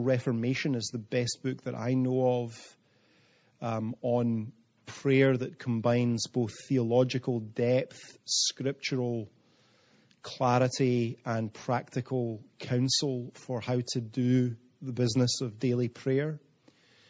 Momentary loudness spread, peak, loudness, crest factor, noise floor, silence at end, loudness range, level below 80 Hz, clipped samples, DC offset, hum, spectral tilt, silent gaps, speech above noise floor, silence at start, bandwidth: 11 LU; -12 dBFS; -30 LUFS; 18 dB; -65 dBFS; 0.7 s; 3 LU; -72 dBFS; under 0.1%; under 0.1%; none; -5.5 dB/octave; none; 36 dB; 0 s; 9.8 kHz